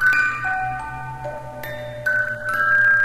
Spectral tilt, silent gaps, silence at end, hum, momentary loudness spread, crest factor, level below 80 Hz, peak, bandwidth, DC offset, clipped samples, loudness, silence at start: -4 dB/octave; none; 0 s; none; 16 LU; 14 dB; -48 dBFS; -8 dBFS; 16 kHz; under 0.1%; under 0.1%; -21 LUFS; 0 s